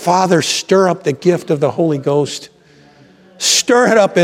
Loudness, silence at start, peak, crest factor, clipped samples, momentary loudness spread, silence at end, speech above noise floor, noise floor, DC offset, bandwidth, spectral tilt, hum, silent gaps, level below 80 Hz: -13 LUFS; 0 s; 0 dBFS; 14 dB; under 0.1%; 7 LU; 0 s; 33 dB; -46 dBFS; under 0.1%; 16 kHz; -4 dB/octave; none; none; -64 dBFS